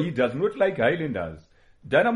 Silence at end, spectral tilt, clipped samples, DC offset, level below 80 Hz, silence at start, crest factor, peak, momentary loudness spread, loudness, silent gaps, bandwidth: 0 s; -7.5 dB/octave; under 0.1%; under 0.1%; -56 dBFS; 0 s; 18 dB; -6 dBFS; 9 LU; -24 LUFS; none; 10.5 kHz